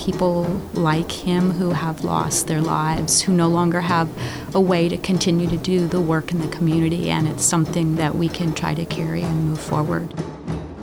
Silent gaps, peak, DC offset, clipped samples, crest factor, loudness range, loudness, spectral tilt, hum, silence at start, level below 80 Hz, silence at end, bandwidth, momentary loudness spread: none; -6 dBFS; 0.2%; under 0.1%; 14 dB; 2 LU; -20 LUFS; -5 dB/octave; none; 0 s; -42 dBFS; 0 s; 16.5 kHz; 7 LU